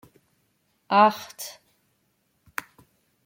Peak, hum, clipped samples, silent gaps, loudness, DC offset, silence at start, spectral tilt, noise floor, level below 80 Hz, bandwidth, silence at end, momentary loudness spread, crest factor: -6 dBFS; none; under 0.1%; none; -24 LUFS; under 0.1%; 0.9 s; -4 dB/octave; -71 dBFS; -76 dBFS; 16.5 kHz; 1.75 s; 19 LU; 22 dB